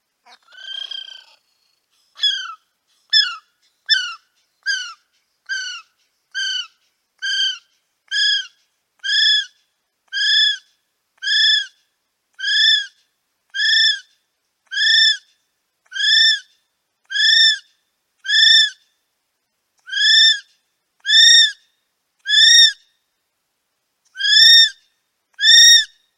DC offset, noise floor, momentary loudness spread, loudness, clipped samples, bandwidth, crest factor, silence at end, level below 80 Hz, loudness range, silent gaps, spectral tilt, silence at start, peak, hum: under 0.1%; -72 dBFS; 22 LU; -12 LUFS; under 0.1%; 16.5 kHz; 18 dB; 0.3 s; -64 dBFS; 10 LU; none; 7 dB/octave; 0.65 s; 0 dBFS; none